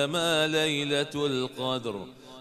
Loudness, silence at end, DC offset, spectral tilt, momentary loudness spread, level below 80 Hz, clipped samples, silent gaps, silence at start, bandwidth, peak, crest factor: -27 LUFS; 0 s; under 0.1%; -4 dB/octave; 12 LU; -68 dBFS; under 0.1%; none; 0 s; 14 kHz; -14 dBFS; 16 dB